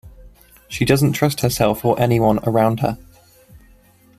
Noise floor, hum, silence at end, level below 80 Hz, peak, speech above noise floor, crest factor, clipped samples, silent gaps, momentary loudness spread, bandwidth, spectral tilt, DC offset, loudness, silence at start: -51 dBFS; none; 0.6 s; -42 dBFS; -2 dBFS; 34 dB; 18 dB; under 0.1%; none; 8 LU; 15.5 kHz; -6 dB/octave; under 0.1%; -18 LUFS; 0.05 s